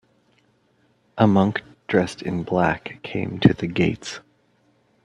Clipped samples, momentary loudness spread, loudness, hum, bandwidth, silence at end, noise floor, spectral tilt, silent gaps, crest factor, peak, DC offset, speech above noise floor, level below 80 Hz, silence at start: under 0.1%; 14 LU; -22 LUFS; none; 11 kHz; 0.85 s; -63 dBFS; -7 dB/octave; none; 22 dB; 0 dBFS; under 0.1%; 42 dB; -52 dBFS; 1.15 s